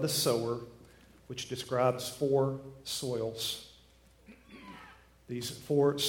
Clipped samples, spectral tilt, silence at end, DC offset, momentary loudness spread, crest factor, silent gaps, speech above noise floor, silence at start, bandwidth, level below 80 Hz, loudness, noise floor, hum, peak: under 0.1%; -4.5 dB/octave; 0 s; under 0.1%; 22 LU; 20 dB; none; 29 dB; 0 s; 17.5 kHz; -64 dBFS; -33 LUFS; -61 dBFS; none; -14 dBFS